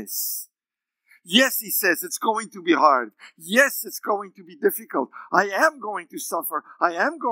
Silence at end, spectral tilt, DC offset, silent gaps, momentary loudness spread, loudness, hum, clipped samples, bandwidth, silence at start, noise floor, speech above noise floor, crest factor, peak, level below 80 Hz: 0 s; -2 dB/octave; under 0.1%; none; 13 LU; -22 LUFS; none; under 0.1%; 16.5 kHz; 0 s; -88 dBFS; 65 dB; 22 dB; -2 dBFS; under -90 dBFS